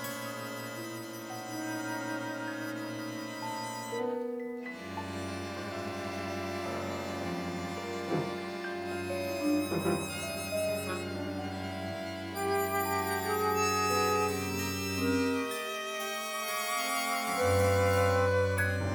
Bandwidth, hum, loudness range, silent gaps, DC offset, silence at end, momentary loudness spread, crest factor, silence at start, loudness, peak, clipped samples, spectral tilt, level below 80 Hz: over 20 kHz; none; 7 LU; none; under 0.1%; 0 s; 10 LU; 18 dB; 0 s; -33 LUFS; -14 dBFS; under 0.1%; -4.5 dB/octave; -66 dBFS